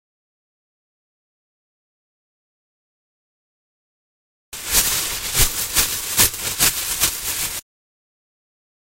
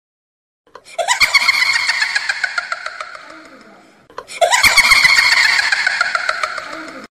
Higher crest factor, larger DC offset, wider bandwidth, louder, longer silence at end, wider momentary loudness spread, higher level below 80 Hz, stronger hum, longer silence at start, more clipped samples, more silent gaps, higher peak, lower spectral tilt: first, 24 dB vs 16 dB; neither; about the same, 16 kHz vs 15.5 kHz; second, -18 LUFS vs -12 LUFS; first, 1.35 s vs 0.1 s; second, 9 LU vs 20 LU; first, -38 dBFS vs -46 dBFS; neither; first, 4.5 s vs 0.9 s; neither; neither; about the same, 0 dBFS vs 0 dBFS; about the same, 0 dB/octave vs 1 dB/octave